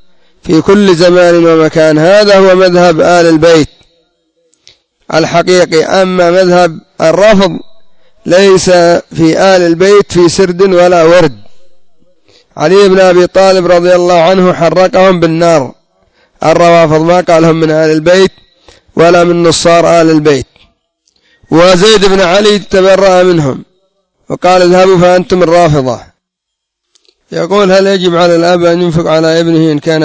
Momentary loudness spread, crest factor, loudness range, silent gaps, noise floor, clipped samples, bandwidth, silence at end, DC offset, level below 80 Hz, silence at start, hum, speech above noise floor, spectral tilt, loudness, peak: 7 LU; 6 dB; 3 LU; none; -73 dBFS; 3%; 8 kHz; 0 s; under 0.1%; -38 dBFS; 0.45 s; none; 67 dB; -5.5 dB/octave; -6 LUFS; 0 dBFS